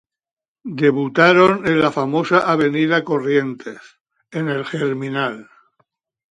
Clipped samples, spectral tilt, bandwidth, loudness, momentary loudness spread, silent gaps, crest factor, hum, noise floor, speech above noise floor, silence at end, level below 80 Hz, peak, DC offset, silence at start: under 0.1%; -6.5 dB/octave; 10.5 kHz; -17 LUFS; 18 LU; 4.01-4.05 s; 18 dB; none; under -90 dBFS; over 73 dB; 0.9 s; -60 dBFS; 0 dBFS; under 0.1%; 0.65 s